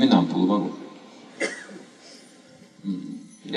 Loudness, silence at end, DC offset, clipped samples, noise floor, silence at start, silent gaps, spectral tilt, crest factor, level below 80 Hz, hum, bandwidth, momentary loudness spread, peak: -25 LUFS; 0 s; under 0.1%; under 0.1%; -51 dBFS; 0 s; none; -6 dB/octave; 22 dB; -78 dBFS; none; 11 kHz; 25 LU; -4 dBFS